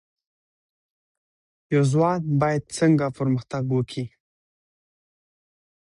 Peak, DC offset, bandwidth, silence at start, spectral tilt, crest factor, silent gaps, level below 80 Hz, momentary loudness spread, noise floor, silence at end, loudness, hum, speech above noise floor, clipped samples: -8 dBFS; under 0.1%; 11 kHz; 1.7 s; -7 dB/octave; 18 dB; none; -60 dBFS; 8 LU; under -90 dBFS; 1.85 s; -23 LUFS; none; over 68 dB; under 0.1%